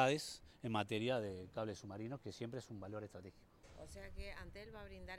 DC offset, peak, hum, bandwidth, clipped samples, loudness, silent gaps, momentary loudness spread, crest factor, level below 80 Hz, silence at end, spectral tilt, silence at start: under 0.1%; -20 dBFS; none; 16.5 kHz; under 0.1%; -45 LUFS; none; 16 LU; 24 dB; -62 dBFS; 0 s; -5 dB/octave; 0 s